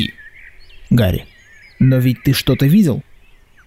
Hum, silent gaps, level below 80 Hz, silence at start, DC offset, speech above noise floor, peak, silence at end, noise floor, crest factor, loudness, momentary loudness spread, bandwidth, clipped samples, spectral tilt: none; none; -38 dBFS; 0 s; under 0.1%; 33 dB; -4 dBFS; 0.65 s; -46 dBFS; 12 dB; -15 LUFS; 11 LU; 16 kHz; under 0.1%; -7 dB/octave